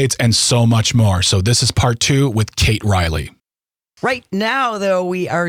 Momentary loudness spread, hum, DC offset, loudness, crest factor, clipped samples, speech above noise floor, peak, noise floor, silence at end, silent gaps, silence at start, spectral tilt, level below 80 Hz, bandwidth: 8 LU; none; under 0.1%; -15 LUFS; 12 dB; under 0.1%; over 75 dB; -4 dBFS; under -90 dBFS; 0 s; none; 0 s; -4 dB/octave; -36 dBFS; 15.5 kHz